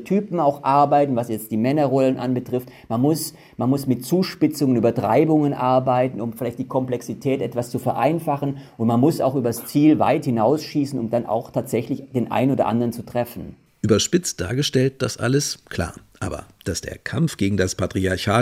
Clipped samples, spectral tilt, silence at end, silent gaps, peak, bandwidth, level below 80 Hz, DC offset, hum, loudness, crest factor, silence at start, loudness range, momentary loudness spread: under 0.1%; -6 dB/octave; 0 s; none; -2 dBFS; 16.5 kHz; -54 dBFS; under 0.1%; none; -21 LUFS; 18 dB; 0 s; 4 LU; 10 LU